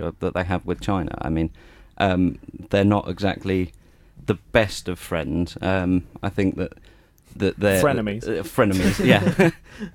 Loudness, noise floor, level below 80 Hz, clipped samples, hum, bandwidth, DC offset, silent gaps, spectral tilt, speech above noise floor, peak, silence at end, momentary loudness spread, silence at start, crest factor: -22 LUFS; -48 dBFS; -42 dBFS; under 0.1%; none; 19 kHz; under 0.1%; none; -6 dB/octave; 26 dB; -2 dBFS; 0.05 s; 9 LU; 0 s; 20 dB